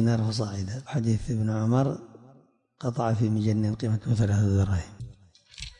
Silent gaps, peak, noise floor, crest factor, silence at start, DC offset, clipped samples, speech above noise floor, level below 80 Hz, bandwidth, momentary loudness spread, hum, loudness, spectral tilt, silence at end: none; -12 dBFS; -59 dBFS; 14 dB; 0 s; under 0.1%; under 0.1%; 34 dB; -50 dBFS; 10 kHz; 13 LU; none; -27 LUFS; -7.5 dB/octave; 0.1 s